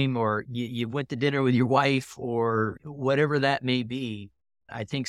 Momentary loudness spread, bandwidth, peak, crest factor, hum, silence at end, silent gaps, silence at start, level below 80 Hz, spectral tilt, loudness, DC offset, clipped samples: 11 LU; 13 kHz; -8 dBFS; 18 dB; none; 0 s; none; 0 s; -66 dBFS; -6.5 dB/octave; -26 LUFS; under 0.1%; under 0.1%